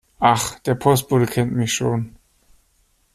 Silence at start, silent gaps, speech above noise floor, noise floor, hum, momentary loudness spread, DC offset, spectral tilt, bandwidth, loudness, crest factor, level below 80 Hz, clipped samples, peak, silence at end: 0.2 s; none; 43 dB; -62 dBFS; none; 6 LU; under 0.1%; -5 dB/octave; 15 kHz; -19 LUFS; 18 dB; -50 dBFS; under 0.1%; -4 dBFS; 1.05 s